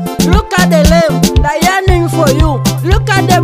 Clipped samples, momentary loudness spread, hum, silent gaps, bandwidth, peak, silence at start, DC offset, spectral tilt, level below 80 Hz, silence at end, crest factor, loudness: 0.3%; 4 LU; none; none; 16.5 kHz; 0 dBFS; 0 s; under 0.1%; -5.5 dB/octave; -16 dBFS; 0 s; 8 dB; -10 LUFS